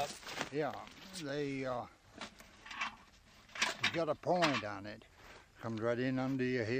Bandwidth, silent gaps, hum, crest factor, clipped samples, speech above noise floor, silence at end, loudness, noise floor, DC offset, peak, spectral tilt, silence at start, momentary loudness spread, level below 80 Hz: 15.5 kHz; none; none; 22 dB; under 0.1%; 25 dB; 0 s; -37 LUFS; -62 dBFS; under 0.1%; -18 dBFS; -4.5 dB/octave; 0 s; 17 LU; -68 dBFS